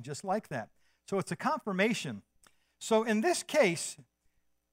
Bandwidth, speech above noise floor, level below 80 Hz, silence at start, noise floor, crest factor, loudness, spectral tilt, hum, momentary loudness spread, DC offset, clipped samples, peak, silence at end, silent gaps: 16 kHz; 42 dB; -76 dBFS; 0 s; -73 dBFS; 20 dB; -31 LUFS; -4 dB/octave; none; 15 LU; under 0.1%; under 0.1%; -14 dBFS; 0.7 s; none